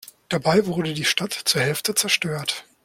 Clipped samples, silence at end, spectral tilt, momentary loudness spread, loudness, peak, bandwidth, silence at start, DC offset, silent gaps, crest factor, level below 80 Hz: under 0.1%; 0.25 s; -3 dB/octave; 6 LU; -21 LUFS; -4 dBFS; 16.5 kHz; 0.05 s; under 0.1%; none; 18 dB; -58 dBFS